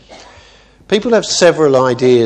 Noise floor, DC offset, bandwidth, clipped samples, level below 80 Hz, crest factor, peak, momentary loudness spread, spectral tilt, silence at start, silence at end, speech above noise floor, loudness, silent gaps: -44 dBFS; under 0.1%; 9.8 kHz; under 0.1%; -50 dBFS; 12 dB; 0 dBFS; 6 LU; -4.5 dB/octave; 0.1 s; 0 s; 33 dB; -12 LUFS; none